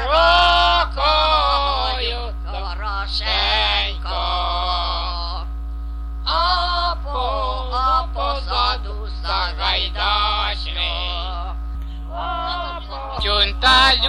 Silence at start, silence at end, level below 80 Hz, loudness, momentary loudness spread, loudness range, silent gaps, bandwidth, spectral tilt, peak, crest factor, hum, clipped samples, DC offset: 0 s; 0 s; -26 dBFS; -19 LUFS; 15 LU; 4 LU; none; 10.5 kHz; -4 dB/octave; -2 dBFS; 18 dB; none; under 0.1%; under 0.1%